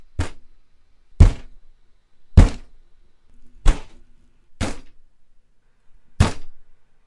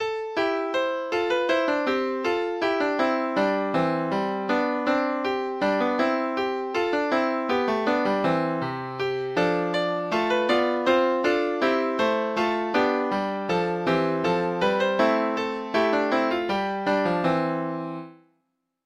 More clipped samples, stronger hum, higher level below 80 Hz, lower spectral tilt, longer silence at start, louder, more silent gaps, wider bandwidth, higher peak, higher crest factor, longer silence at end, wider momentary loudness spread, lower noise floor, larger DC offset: neither; neither; first, -24 dBFS vs -60 dBFS; about the same, -6.5 dB/octave vs -6 dB/octave; first, 0.15 s vs 0 s; first, -21 LUFS vs -24 LUFS; neither; about the same, 11.5 kHz vs 12.5 kHz; first, 0 dBFS vs -10 dBFS; about the same, 20 dB vs 16 dB; second, 0.45 s vs 0.75 s; first, 23 LU vs 4 LU; second, -52 dBFS vs -75 dBFS; neither